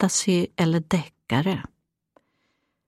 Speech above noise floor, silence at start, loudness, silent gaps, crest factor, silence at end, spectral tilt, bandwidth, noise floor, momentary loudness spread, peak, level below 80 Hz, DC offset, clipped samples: 50 dB; 0 s; -24 LUFS; none; 18 dB; 1.25 s; -5 dB/octave; 14.5 kHz; -73 dBFS; 8 LU; -8 dBFS; -58 dBFS; under 0.1%; under 0.1%